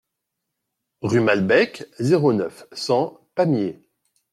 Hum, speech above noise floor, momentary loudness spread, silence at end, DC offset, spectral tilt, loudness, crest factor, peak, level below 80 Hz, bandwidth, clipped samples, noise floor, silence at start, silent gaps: none; 60 dB; 12 LU; 0.6 s; under 0.1%; -6.5 dB/octave; -21 LUFS; 18 dB; -4 dBFS; -64 dBFS; 13 kHz; under 0.1%; -80 dBFS; 1.05 s; none